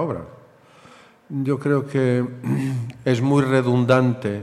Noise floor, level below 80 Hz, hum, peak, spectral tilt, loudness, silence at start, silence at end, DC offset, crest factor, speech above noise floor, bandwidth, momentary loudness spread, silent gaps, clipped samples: -49 dBFS; -60 dBFS; none; -4 dBFS; -8 dB/octave; -21 LUFS; 0 s; 0 s; under 0.1%; 18 dB; 30 dB; 11.5 kHz; 9 LU; none; under 0.1%